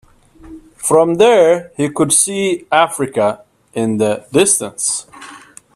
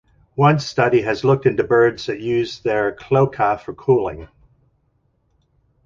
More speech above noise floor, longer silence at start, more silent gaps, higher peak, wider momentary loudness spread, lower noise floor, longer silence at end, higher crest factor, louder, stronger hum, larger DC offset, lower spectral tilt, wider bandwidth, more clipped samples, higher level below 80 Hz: second, 27 dB vs 47 dB; about the same, 0.45 s vs 0.35 s; neither; about the same, 0 dBFS vs -2 dBFS; first, 14 LU vs 8 LU; second, -41 dBFS vs -64 dBFS; second, 0.35 s vs 1.6 s; about the same, 16 dB vs 18 dB; first, -14 LUFS vs -18 LUFS; neither; neither; second, -3.5 dB/octave vs -7 dB/octave; first, 15 kHz vs 7.4 kHz; neither; about the same, -54 dBFS vs -50 dBFS